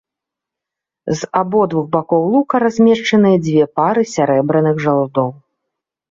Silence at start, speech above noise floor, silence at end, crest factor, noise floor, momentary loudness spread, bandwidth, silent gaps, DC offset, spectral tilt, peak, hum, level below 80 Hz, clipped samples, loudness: 1.05 s; 70 dB; 0.75 s; 14 dB; -84 dBFS; 7 LU; 7.8 kHz; none; under 0.1%; -6.5 dB/octave; -2 dBFS; none; -58 dBFS; under 0.1%; -15 LUFS